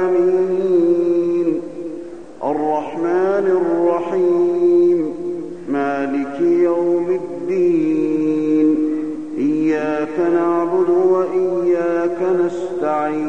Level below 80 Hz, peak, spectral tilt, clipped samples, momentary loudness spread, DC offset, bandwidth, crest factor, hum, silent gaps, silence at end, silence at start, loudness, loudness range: -58 dBFS; -6 dBFS; -8 dB/octave; under 0.1%; 8 LU; 0.8%; 7.2 kHz; 12 dB; none; none; 0 s; 0 s; -17 LUFS; 1 LU